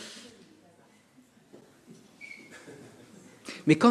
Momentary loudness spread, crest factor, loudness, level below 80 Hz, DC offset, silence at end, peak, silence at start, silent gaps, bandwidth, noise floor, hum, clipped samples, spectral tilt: 27 LU; 24 dB; -30 LUFS; -78 dBFS; under 0.1%; 0 s; -8 dBFS; 0 s; none; 12.5 kHz; -60 dBFS; none; under 0.1%; -6 dB/octave